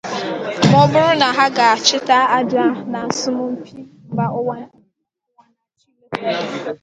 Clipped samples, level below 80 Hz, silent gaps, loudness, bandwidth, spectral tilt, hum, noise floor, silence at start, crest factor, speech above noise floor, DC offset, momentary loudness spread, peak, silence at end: under 0.1%; -58 dBFS; none; -16 LUFS; 9.4 kHz; -4.5 dB/octave; none; -73 dBFS; 0.05 s; 18 dB; 57 dB; under 0.1%; 13 LU; 0 dBFS; 0.05 s